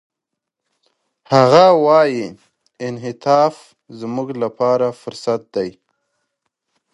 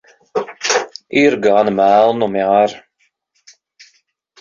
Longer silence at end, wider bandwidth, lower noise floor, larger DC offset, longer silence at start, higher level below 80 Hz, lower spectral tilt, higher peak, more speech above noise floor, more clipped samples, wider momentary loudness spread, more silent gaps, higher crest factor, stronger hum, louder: second, 1.25 s vs 1.6 s; first, 11.5 kHz vs 7.6 kHz; first, -81 dBFS vs -64 dBFS; neither; first, 1.3 s vs 0.35 s; second, -64 dBFS vs -58 dBFS; first, -6 dB/octave vs -4 dB/octave; about the same, 0 dBFS vs -2 dBFS; first, 66 dB vs 51 dB; neither; first, 17 LU vs 10 LU; neither; about the same, 18 dB vs 14 dB; neither; about the same, -16 LUFS vs -15 LUFS